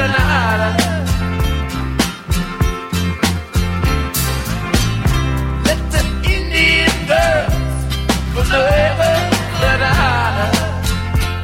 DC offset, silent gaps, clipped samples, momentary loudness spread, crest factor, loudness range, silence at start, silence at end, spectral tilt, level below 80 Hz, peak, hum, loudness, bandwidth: under 0.1%; none; under 0.1%; 6 LU; 14 dB; 4 LU; 0 s; 0 s; -4.5 dB/octave; -22 dBFS; 0 dBFS; none; -16 LUFS; 16.5 kHz